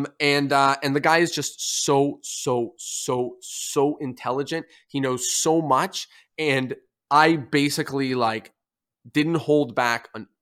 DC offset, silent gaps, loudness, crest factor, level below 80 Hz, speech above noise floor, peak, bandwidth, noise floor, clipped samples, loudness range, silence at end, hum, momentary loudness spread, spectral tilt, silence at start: under 0.1%; none; -23 LUFS; 20 dB; -70 dBFS; 57 dB; -2 dBFS; 16 kHz; -80 dBFS; under 0.1%; 3 LU; 0.15 s; none; 11 LU; -3.5 dB/octave; 0 s